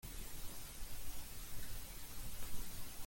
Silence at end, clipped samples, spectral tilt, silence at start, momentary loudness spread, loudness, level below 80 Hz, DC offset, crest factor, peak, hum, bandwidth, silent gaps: 0 s; under 0.1%; -2.5 dB/octave; 0.05 s; 1 LU; -50 LUFS; -52 dBFS; under 0.1%; 14 dB; -28 dBFS; none; 17 kHz; none